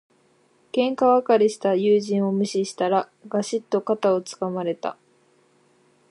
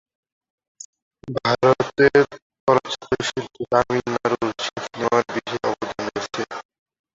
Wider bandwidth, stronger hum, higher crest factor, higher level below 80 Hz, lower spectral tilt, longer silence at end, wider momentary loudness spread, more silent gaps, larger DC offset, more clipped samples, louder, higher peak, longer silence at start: first, 11.5 kHz vs 7.8 kHz; neither; about the same, 16 dB vs 20 dB; second, -78 dBFS vs -56 dBFS; about the same, -5.5 dB/octave vs -5 dB/octave; first, 1.2 s vs 0.6 s; second, 10 LU vs 14 LU; second, none vs 2.42-2.50 s, 2.60-2.67 s; neither; neither; about the same, -23 LUFS vs -22 LUFS; second, -6 dBFS vs -2 dBFS; second, 0.75 s vs 1.25 s